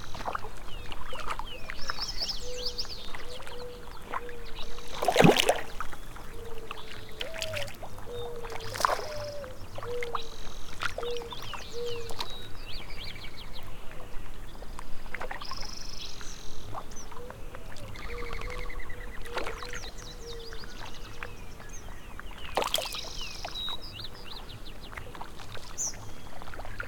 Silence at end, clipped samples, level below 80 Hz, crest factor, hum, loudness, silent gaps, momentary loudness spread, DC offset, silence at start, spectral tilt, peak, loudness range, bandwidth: 0 s; under 0.1%; -42 dBFS; 26 dB; none; -35 LUFS; none; 15 LU; under 0.1%; 0 s; -3.5 dB/octave; -4 dBFS; 13 LU; 18 kHz